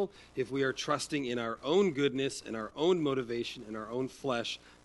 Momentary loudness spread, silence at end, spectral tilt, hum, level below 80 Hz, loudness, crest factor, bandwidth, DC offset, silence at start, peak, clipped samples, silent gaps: 10 LU; 0.15 s; -4.5 dB/octave; none; -66 dBFS; -33 LUFS; 16 dB; 11.5 kHz; under 0.1%; 0 s; -16 dBFS; under 0.1%; none